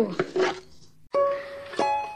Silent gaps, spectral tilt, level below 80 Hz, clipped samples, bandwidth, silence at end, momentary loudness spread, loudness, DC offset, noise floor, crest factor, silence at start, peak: none; -5 dB/octave; -62 dBFS; under 0.1%; 11 kHz; 0 s; 8 LU; -27 LUFS; under 0.1%; -53 dBFS; 18 dB; 0 s; -10 dBFS